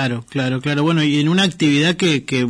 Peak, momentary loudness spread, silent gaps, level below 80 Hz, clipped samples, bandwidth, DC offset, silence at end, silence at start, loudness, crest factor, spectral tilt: -6 dBFS; 6 LU; none; -56 dBFS; under 0.1%; 10.5 kHz; under 0.1%; 0 s; 0 s; -17 LUFS; 12 dB; -5.5 dB/octave